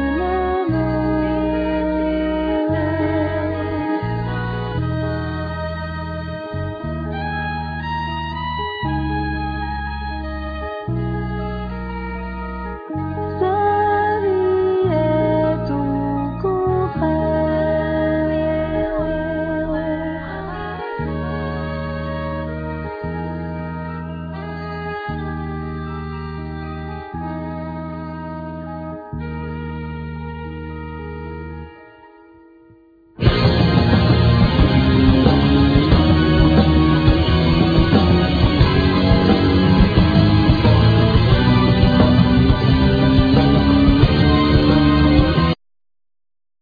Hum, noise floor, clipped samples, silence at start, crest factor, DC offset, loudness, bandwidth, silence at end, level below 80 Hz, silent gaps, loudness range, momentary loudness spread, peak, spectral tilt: none; -49 dBFS; under 0.1%; 0 s; 18 dB; under 0.1%; -18 LUFS; 5 kHz; 1.1 s; -26 dBFS; none; 14 LU; 15 LU; 0 dBFS; -9 dB/octave